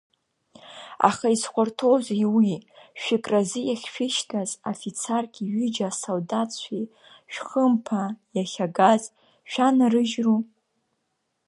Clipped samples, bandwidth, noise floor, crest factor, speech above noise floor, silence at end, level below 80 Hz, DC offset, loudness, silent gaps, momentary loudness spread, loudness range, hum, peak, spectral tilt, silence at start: under 0.1%; 11.5 kHz; -76 dBFS; 22 dB; 52 dB; 1.05 s; -74 dBFS; under 0.1%; -24 LUFS; none; 14 LU; 4 LU; none; -2 dBFS; -4.5 dB/octave; 0.65 s